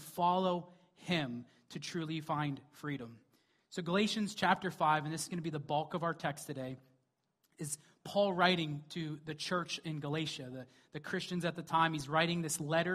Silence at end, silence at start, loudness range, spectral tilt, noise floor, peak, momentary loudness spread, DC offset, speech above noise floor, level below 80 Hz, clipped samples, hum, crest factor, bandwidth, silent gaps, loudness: 0 s; 0 s; 4 LU; -4.5 dB/octave; -80 dBFS; -12 dBFS; 14 LU; under 0.1%; 44 dB; -74 dBFS; under 0.1%; none; 24 dB; 15.5 kHz; none; -36 LUFS